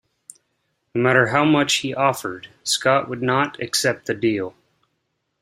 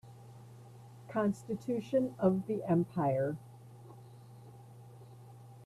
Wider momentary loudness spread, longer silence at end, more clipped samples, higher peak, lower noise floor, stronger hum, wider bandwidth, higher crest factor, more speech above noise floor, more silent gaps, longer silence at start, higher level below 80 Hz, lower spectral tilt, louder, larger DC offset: second, 12 LU vs 23 LU; first, 0.9 s vs 0 s; neither; first, -2 dBFS vs -16 dBFS; first, -74 dBFS vs -53 dBFS; neither; first, 16 kHz vs 13.5 kHz; about the same, 20 dB vs 20 dB; first, 53 dB vs 21 dB; neither; first, 0.95 s vs 0.05 s; first, -62 dBFS vs -72 dBFS; second, -4 dB/octave vs -8.5 dB/octave; first, -20 LUFS vs -34 LUFS; neither